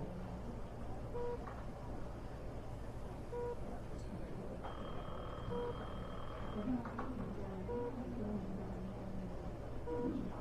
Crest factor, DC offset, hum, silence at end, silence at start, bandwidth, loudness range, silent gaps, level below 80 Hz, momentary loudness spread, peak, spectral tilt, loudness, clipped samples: 14 dB; under 0.1%; none; 0 s; 0 s; 12 kHz; 3 LU; none; -50 dBFS; 7 LU; -28 dBFS; -8 dB/octave; -45 LUFS; under 0.1%